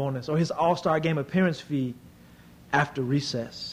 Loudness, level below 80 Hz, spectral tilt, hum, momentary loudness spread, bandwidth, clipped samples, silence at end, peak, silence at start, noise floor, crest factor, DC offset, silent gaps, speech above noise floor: -27 LUFS; -60 dBFS; -6 dB/octave; none; 7 LU; 15.5 kHz; under 0.1%; 0 s; -8 dBFS; 0 s; -51 dBFS; 18 dB; under 0.1%; none; 25 dB